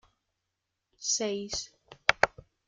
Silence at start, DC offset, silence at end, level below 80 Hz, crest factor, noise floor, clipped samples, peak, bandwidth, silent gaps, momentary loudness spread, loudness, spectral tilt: 1 s; under 0.1%; 0.4 s; -60 dBFS; 32 dB; -84 dBFS; under 0.1%; -2 dBFS; 11 kHz; none; 11 LU; -30 LUFS; -1 dB/octave